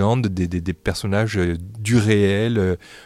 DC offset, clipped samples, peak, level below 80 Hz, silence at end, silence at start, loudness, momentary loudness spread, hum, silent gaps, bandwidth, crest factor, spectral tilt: under 0.1%; under 0.1%; -4 dBFS; -44 dBFS; 0.05 s; 0 s; -20 LUFS; 7 LU; none; none; 14.5 kHz; 16 dB; -6.5 dB/octave